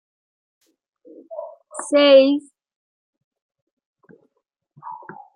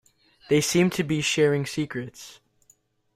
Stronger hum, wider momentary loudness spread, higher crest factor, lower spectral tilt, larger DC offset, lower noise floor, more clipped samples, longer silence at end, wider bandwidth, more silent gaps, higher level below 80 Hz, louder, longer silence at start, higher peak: neither; first, 25 LU vs 18 LU; about the same, 20 dB vs 16 dB; second, -2.5 dB/octave vs -4.5 dB/octave; neither; first, -75 dBFS vs -63 dBFS; neither; second, 0.4 s vs 0.8 s; second, 10.5 kHz vs 16 kHz; first, 2.76-3.13 s, 3.24-3.31 s, 3.42-3.49 s, 3.62-3.77 s, 3.86-3.94 s vs none; second, -80 dBFS vs -60 dBFS; first, -15 LUFS vs -24 LUFS; first, 1.3 s vs 0.5 s; first, -2 dBFS vs -10 dBFS